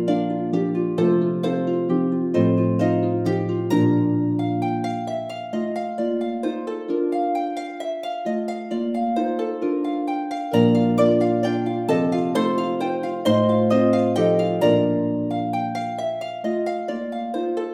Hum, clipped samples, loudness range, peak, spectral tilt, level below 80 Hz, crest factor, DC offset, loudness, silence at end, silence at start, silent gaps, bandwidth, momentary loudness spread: none; under 0.1%; 5 LU; -4 dBFS; -8 dB/octave; -62 dBFS; 16 dB; under 0.1%; -22 LUFS; 0 s; 0 s; none; 13.5 kHz; 9 LU